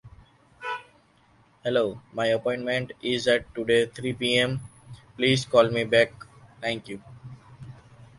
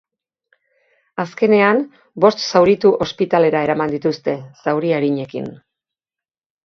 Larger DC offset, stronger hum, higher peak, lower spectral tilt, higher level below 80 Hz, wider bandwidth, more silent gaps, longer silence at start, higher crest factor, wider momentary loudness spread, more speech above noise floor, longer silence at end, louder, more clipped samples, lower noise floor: neither; neither; second, -4 dBFS vs 0 dBFS; second, -4.5 dB/octave vs -6 dB/octave; about the same, -58 dBFS vs -58 dBFS; first, 11.5 kHz vs 7 kHz; neither; second, 0.05 s vs 1.15 s; about the same, 22 dB vs 18 dB; first, 24 LU vs 14 LU; second, 35 dB vs over 74 dB; second, 0.15 s vs 1.1 s; second, -25 LUFS vs -17 LUFS; neither; second, -60 dBFS vs under -90 dBFS